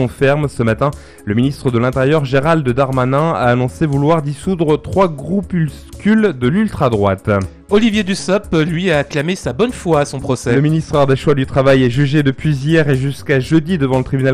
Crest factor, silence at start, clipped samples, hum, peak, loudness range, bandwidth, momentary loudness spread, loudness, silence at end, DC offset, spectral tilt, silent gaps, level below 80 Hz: 12 dB; 0 s; under 0.1%; none; -2 dBFS; 2 LU; 13.5 kHz; 5 LU; -15 LUFS; 0 s; under 0.1%; -7 dB/octave; none; -36 dBFS